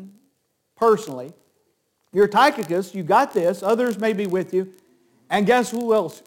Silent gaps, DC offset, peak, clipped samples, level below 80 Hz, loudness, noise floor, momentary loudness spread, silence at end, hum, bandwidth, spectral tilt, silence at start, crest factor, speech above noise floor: none; under 0.1%; -4 dBFS; under 0.1%; -68 dBFS; -20 LUFS; -70 dBFS; 9 LU; 0.1 s; none; 17 kHz; -5 dB/octave; 0 s; 18 dB; 50 dB